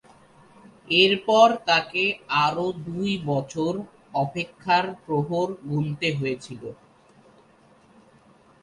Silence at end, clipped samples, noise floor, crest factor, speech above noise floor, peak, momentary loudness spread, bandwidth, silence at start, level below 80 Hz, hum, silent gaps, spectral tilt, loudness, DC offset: 1.9 s; under 0.1%; -56 dBFS; 20 dB; 33 dB; -6 dBFS; 13 LU; 11.5 kHz; 0.85 s; -62 dBFS; none; none; -5 dB/octave; -23 LUFS; under 0.1%